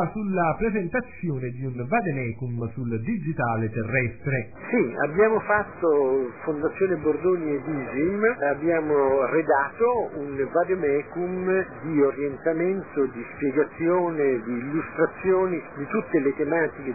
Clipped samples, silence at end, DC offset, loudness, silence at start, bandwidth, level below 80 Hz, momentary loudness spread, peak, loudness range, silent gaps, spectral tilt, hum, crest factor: under 0.1%; 0 s; 0.2%; -25 LUFS; 0 s; 2.6 kHz; -54 dBFS; 8 LU; -8 dBFS; 4 LU; none; -15 dB/octave; none; 16 dB